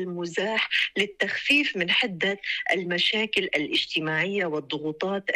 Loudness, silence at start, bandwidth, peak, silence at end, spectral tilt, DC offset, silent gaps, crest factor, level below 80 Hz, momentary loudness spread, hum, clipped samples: -24 LUFS; 0 s; 13.5 kHz; -12 dBFS; 0 s; -4 dB/octave; under 0.1%; none; 14 dB; -66 dBFS; 8 LU; none; under 0.1%